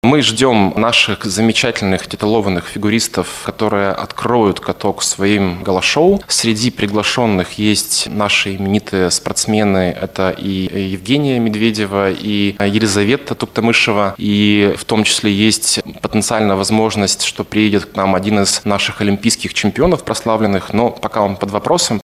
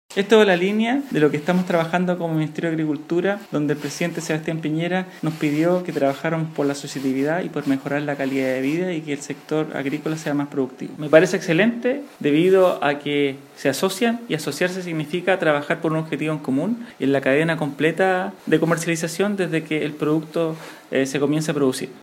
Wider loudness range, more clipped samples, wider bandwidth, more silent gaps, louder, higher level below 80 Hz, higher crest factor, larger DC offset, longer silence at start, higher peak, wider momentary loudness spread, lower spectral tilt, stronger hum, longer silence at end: about the same, 3 LU vs 4 LU; neither; about the same, 15 kHz vs 16.5 kHz; neither; first, -14 LUFS vs -21 LUFS; first, -44 dBFS vs -72 dBFS; second, 14 dB vs 20 dB; neither; about the same, 0.05 s vs 0.1 s; about the same, 0 dBFS vs 0 dBFS; about the same, 6 LU vs 8 LU; second, -4 dB/octave vs -5.5 dB/octave; neither; about the same, 0 s vs 0 s